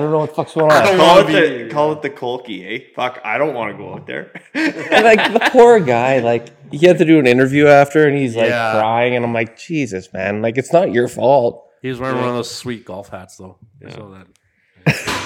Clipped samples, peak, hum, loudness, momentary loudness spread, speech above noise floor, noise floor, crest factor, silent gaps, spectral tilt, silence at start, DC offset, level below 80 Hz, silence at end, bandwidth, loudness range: 0.3%; 0 dBFS; none; -14 LUFS; 17 LU; 20 dB; -34 dBFS; 14 dB; none; -5.5 dB/octave; 0 s; under 0.1%; -56 dBFS; 0 s; 16.5 kHz; 10 LU